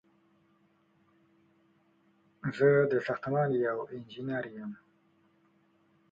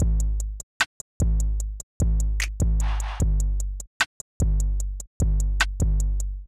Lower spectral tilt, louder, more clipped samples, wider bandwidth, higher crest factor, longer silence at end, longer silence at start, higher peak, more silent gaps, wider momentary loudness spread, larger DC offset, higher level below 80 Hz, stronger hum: first, -8.5 dB/octave vs -4 dB/octave; second, -31 LUFS vs -27 LUFS; neither; second, 7.4 kHz vs 12.5 kHz; about the same, 20 dB vs 16 dB; first, 1.35 s vs 0 s; first, 2.45 s vs 0 s; second, -12 dBFS vs -8 dBFS; second, none vs 0.63-0.80 s, 0.86-1.20 s, 1.83-2.00 s, 3.87-4.00 s, 4.06-4.40 s, 5.07-5.20 s; first, 18 LU vs 7 LU; neither; second, -74 dBFS vs -24 dBFS; neither